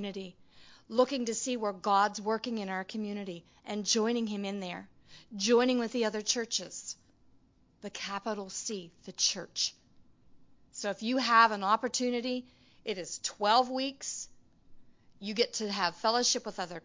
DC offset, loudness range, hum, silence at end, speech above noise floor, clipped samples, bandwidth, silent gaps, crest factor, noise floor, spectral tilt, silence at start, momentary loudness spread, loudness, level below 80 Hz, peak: under 0.1%; 6 LU; none; 0.05 s; 33 dB; under 0.1%; 7.8 kHz; none; 24 dB; -64 dBFS; -2.5 dB/octave; 0 s; 17 LU; -31 LUFS; -72 dBFS; -10 dBFS